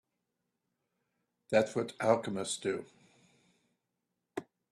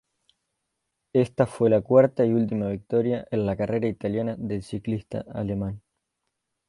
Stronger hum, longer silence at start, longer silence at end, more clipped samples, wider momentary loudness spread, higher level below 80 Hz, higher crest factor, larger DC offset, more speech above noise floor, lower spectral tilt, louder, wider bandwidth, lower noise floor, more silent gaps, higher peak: neither; first, 1.5 s vs 1.15 s; second, 0.3 s vs 0.9 s; neither; first, 15 LU vs 12 LU; second, -76 dBFS vs -54 dBFS; about the same, 24 dB vs 20 dB; neither; about the same, 53 dB vs 56 dB; second, -4.5 dB/octave vs -9 dB/octave; second, -33 LUFS vs -25 LUFS; about the same, 12.5 kHz vs 11.5 kHz; first, -85 dBFS vs -80 dBFS; neither; second, -12 dBFS vs -6 dBFS